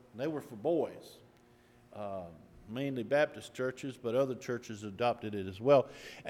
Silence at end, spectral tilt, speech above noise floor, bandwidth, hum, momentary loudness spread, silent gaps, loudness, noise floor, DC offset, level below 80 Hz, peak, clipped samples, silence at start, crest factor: 0 s; -6 dB/octave; 29 dB; 15 kHz; none; 17 LU; none; -34 LUFS; -63 dBFS; under 0.1%; -72 dBFS; -14 dBFS; under 0.1%; 0.15 s; 20 dB